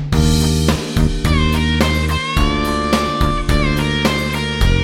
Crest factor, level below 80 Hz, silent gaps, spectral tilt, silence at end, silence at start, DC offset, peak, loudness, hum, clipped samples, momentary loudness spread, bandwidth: 14 dB; -20 dBFS; none; -5 dB/octave; 0 s; 0 s; under 0.1%; 0 dBFS; -16 LUFS; none; under 0.1%; 3 LU; 16.5 kHz